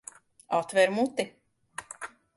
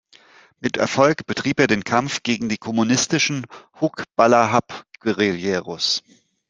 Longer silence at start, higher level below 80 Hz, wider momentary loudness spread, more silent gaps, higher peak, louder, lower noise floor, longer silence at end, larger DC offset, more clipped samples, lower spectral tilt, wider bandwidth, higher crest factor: about the same, 0.5 s vs 0.6 s; second, -74 dBFS vs -60 dBFS; first, 20 LU vs 9 LU; neither; second, -10 dBFS vs -2 dBFS; second, -28 LUFS vs -20 LUFS; second, -46 dBFS vs -51 dBFS; second, 0.3 s vs 0.5 s; neither; neither; about the same, -4 dB/octave vs -4 dB/octave; first, 11.5 kHz vs 10 kHz; about the same, 20 dB vs 20 dB